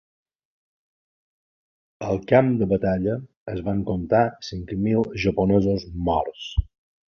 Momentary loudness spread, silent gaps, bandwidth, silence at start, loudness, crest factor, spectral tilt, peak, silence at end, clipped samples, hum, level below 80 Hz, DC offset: 12 LU; 3.37-3.46 s; 6.8 kHz; 2 s; -23 LUFS; 22 dB; -8 dB/octave; -2 dBFS; 0.45 s; under 0.1%; none; -38 dBFS; under 0.1%